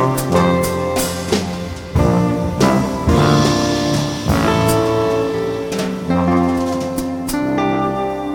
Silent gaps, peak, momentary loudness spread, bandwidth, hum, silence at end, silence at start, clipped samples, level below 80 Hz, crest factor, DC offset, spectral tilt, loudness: none; -2 dBFS; 7 LU; 17.5 kHz; none; 0 s; 0 s; under 0.1%; -32 dBFS; 14 dB; under 0.1%; -5.5 dB/octave; -17 LUFS